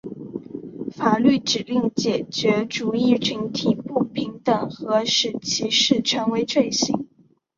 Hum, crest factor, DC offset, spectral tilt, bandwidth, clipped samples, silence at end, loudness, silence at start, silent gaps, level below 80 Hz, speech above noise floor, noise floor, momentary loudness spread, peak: none; 18 dB; under 0.1%; -4 dB/octave; 7.6 kHz; under 0.1%; 0.55 s; -21 LUFS; 0.05 s; none; -62 dBFS; 37 dB; -58 dBFS; 15 LU; -4 dBFS